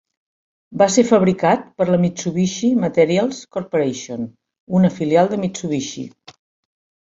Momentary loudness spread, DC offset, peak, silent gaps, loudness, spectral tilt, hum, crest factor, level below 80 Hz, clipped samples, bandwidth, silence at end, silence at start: 14 LU; under 0.1%; -2 dBFS; 4.60-4.67 s; -18 LUFS; -6 dB/octave; none; 18 dB; -58 dBFS; under 0.1%; 7.8 kHz; 1 s; 0.7 s